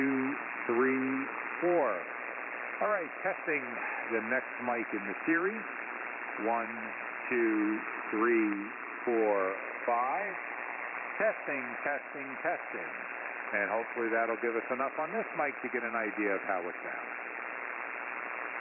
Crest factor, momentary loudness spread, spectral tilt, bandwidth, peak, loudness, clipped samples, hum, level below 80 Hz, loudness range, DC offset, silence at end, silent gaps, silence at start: 16 dB; 9 LU; 1.5 dB/octave; 3 kHz; -18 dBFS; -33 LUFS; under 0.1%; none; -86 dBFS; 3 LU; under 0.1%; 0 s; none; 0 s